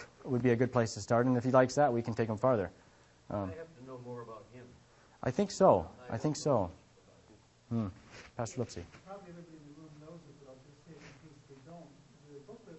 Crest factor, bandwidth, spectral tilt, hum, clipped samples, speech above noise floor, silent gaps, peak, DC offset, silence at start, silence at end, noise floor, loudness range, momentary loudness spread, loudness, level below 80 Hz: 24 dB; 8.4 kHz; -6.5 dB/octave; none; under 0.1%; 30 dB; none; -12 dBFS; under 0.1%; 0 s; 0 s; -62 dBFS; 21 LU; 26 LU; -32 LUFS; -64 dBFS